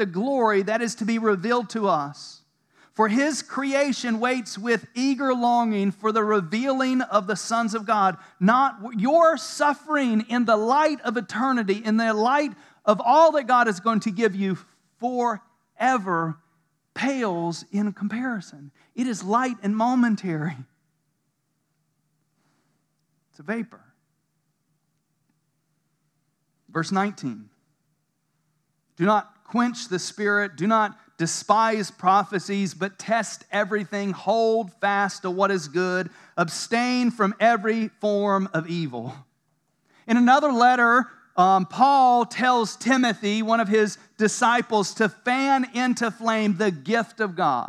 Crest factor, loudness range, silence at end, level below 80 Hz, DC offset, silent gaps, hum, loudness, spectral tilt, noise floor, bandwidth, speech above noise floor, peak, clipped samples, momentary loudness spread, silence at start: 20 dB; 12 LU; 0 s; -88 dBFS; under 0.1%; none; none; -23 LUFS; -5 dB/octave; -74 dBFS; 12.5 kHz; 51 dB; -4 dBFS; under 0.1%; 10 LU; 0 s